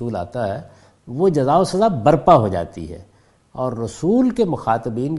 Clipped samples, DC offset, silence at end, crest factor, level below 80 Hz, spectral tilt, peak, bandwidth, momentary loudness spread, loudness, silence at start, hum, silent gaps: under 0.1%; under 0.1%; 0 s; 18 dB; -46 dBFS; -7.5 dB/octave; 0 dBFS; 11.5 kHz; 18 LU; -18 LUFS; 0 s; none; none